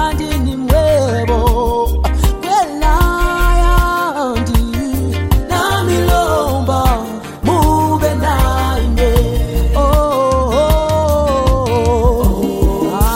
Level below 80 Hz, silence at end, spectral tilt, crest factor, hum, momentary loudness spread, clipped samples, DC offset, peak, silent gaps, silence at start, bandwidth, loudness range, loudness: -16 dBFS; 0 s; -6 dB/octave; 12 dB; none; 4 LU; under 0.1%; under 0.1%; 0 dBFS; none; 0 s; 16.5 kHz; 1 LU; -14 LUFS